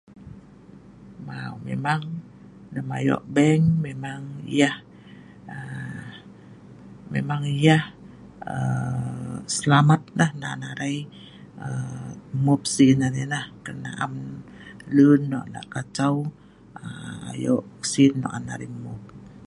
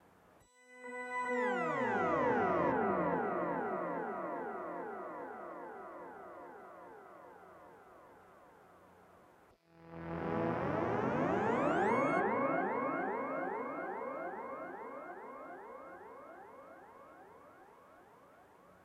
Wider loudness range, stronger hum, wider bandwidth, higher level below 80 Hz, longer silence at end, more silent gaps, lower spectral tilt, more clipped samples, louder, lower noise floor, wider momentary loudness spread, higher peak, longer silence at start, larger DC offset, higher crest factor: second, 5 LU vs 20 LU; neither; second, 11.5 kHz vs 14 kHz; first, -56 dBFS vs -70 dBFS; about the same, 0 s vs 0.1 s; neither; second, -6 dB/octave vs -7.5 dB/octave; neither; first, -23 LUFS vs -36 LUFS; second, -47 dBFS vs -65 dBFS; about the same, 22 LU vs 23 LU; first, -4 dBFS vs -20 dBFS; second, 0.15 s vs 0.7 s; neither; about the same, 20 dB vs 20 dB